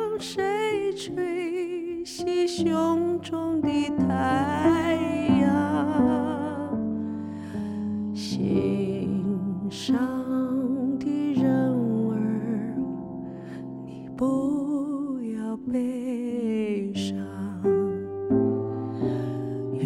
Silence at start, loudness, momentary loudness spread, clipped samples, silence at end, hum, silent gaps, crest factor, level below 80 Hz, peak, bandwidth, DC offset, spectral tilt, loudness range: 0 s; -26 LUFS; 9 LU; under 0.1%; 0 s; none; none; 16 dB; -58 dBFS; -10 dBFS; 12 kHz; under 0.1%; -7 dB/octave; 5 LU